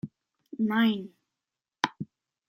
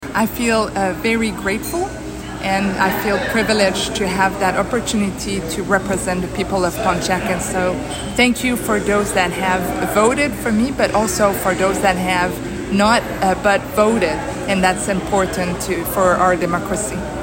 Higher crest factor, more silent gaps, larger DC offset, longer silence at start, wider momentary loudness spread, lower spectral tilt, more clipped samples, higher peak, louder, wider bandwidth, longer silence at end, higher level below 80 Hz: first, 26 dB vs 16 dB; neither; neither; about the same, 0.05 s vs 0 s; first, 20 LU vs 6 LU; first, -5.5 dB/octave vs -4 dB/octave; neither; second, -6 dBFS vs -2 dBFS; second, -29 LUFS vs -18 LUFS; about the same, 15.5 kHz vs 16.5 kHz; first, 0.45 s vs 0 s; second, -74 dBFS vs -36 dBFS